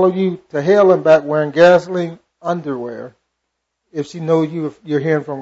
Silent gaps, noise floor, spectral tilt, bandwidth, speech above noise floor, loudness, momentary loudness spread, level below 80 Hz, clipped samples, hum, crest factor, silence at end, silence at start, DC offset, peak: none; -75 dBFS; -7 dB/octave; 8 kHz; 60 dB; -15 LUFS; 16 LU; -60 dBFS; under 0.1%; none; 14 dB; 0 s; 0 s; under 0.1%; -2 dBFS